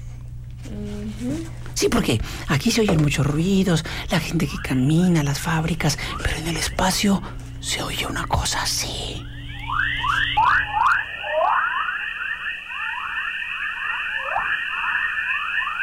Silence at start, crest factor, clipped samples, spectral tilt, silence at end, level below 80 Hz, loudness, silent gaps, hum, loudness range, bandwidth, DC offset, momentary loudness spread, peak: 0 s; 14 dB; under 0.1%; -4.5 dB/octave; 0 s; -36 dBFS; -22 LUFS; none; none; 3 LU; 16.5 kHz; under 0.1%; 12 LU; -10 dBFS